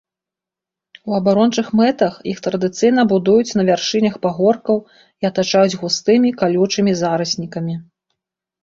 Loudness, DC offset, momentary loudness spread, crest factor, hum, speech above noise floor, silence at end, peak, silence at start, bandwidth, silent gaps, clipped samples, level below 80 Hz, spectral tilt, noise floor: -17 LUFS; under 0.1%; 8 LU; 16 dB; none; 71 dB; 0.8 s; -2 dBFS; 1.05 s; 7.8 kHz; none; under 0.1%; -58 dBFS; -5.5 dB/octave; -87 dBFS